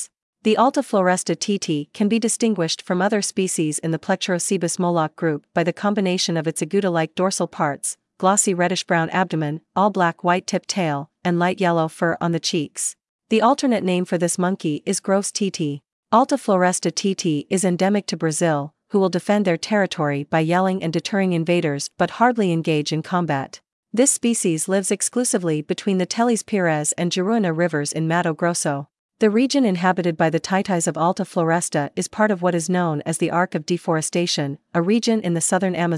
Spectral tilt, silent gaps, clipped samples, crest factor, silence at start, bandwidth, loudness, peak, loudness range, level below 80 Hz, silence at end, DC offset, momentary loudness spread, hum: -4.5 dB/octave; 0.22-0.33 s, 13.09-13.19 s, 15.92-16.03 s, 23.72-23.83 s, 28.99-29.09 s; under 0.1%; 20 dB; 0 s; 12 kHz; -21 LUFS; -2 dBFS; 1 LU; -70 dBFS; 0 s; under 0.1%; 6 LU; none